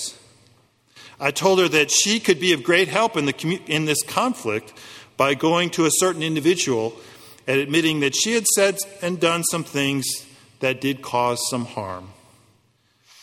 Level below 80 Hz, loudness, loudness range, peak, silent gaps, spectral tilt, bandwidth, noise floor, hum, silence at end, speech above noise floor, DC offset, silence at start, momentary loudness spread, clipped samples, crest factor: -64 dBFS; -20 LUFS; 4 LU; -2 dBFS; none; -3 dB/octave; 16.5 kHz; -62 dBFS; none; 1.1 s; 42 dB; under 0.1%; 0 s; 12 LU; under 0.1%; 20 dB